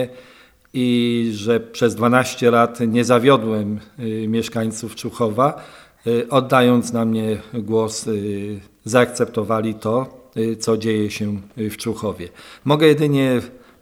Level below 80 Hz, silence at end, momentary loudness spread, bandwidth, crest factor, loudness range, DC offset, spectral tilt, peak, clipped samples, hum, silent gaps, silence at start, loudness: -56 dBFS; 0.25 s; 13 LU; 16 kHz; 18 dB; 4 LU; under 0.1%; -5.5 dB/octave; 0 dBFS; under 0.1%; none; none; 0 s; -19 LUFS